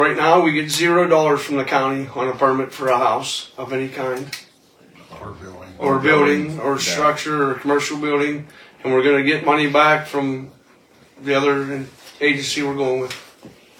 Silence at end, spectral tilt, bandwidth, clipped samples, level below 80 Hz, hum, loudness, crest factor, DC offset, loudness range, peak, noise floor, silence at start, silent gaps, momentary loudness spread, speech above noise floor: 0.3 s; -4.5 dB/octave; 17.5 kHz; under 0.1%; -60 dBFS; none; -18 LUFS; 20 dB; under 0.1%; 4 LU; 0 dBFS; -51 dBFS; 0 s; none; 16 LU; 33 dB